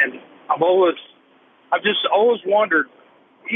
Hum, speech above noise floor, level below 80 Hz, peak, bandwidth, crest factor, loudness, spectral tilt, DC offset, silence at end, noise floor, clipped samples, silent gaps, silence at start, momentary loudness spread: none; 37 dB; -84 dBFS; -4 dBFS; 3.9 kHz; 16 dB; -18 LUFS; -8.5 dB/octave; under 0.1%; 0 s; -54 dBFS; under 0.1%; none; 0 s; 12 LU